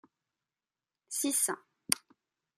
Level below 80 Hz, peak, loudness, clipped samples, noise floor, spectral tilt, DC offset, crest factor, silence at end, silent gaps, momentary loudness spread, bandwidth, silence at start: -86 dBFS; -2 dBFS; -32 LUFS; under 0.1%; under -90 dBFS; -0.5 dB/octave; under 0.1%; 36 dB; 0.6 s; none; 9 LU; 14.5 kHz; 1.1 s